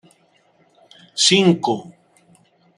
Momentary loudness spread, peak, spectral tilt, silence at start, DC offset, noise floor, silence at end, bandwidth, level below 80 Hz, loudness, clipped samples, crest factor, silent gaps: 15 LU; 0 dBFS; -3.5 dB/octave; 1.15 s; under 0.1%; -59 dBFS; 0.95 s; 12 kHz; -66 dBFS; -16 LUFS; under 0.1%; 22 dB; none